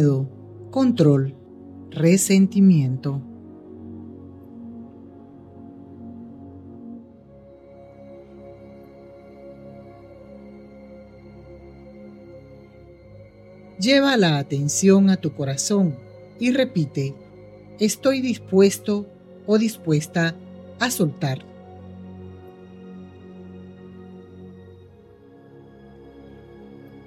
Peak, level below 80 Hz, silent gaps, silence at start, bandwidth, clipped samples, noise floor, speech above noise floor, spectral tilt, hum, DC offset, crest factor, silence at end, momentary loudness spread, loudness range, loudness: -4 dBFS; -60 dBFS; none; 0 s; 14 kHz; under 0.1%; -48 dBFS; 29 dB; -5.5 dB/octave; none; under 0.1%; 20 dB; 0.05 s; 27 LU; 24 LU; -20 LUFS